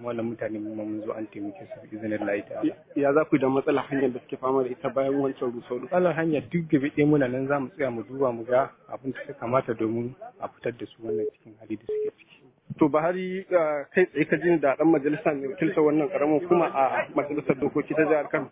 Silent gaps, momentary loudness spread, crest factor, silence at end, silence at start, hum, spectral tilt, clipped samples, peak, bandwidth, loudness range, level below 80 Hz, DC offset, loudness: none; 12 LU; 18 dB; 0.05 s; 0 s; none; -11 dB/octave; under 0.1%; -8 dBFS; 3.9 kHz; 7 LU; -64 dBFS; under 0.1%; -26 LUFS